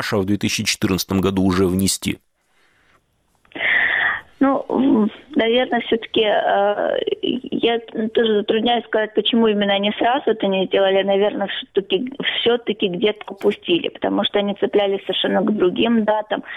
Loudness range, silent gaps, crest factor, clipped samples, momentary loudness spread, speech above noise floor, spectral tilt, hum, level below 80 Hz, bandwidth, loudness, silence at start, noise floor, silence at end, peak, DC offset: 2 LU; none; 14 dB; under 0.1%; 5 LU; 43 dB; -4.5 dB/octave; none; -54 dBFS; 16.5 kHz; -19 LUFS; 0 s; -62 dBFS; 0 s; -4 dBFS; under 0.1%